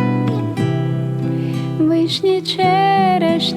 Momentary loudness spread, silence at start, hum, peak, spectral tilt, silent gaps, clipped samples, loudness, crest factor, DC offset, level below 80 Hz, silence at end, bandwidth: 7 LU; 0 s; none; -4 dBFS; -6.5 dB/octave; none; under 0.1%; -17 LUFS; 12 dB; under 0.1%; -56 dBFS; 0 s; 13 kHz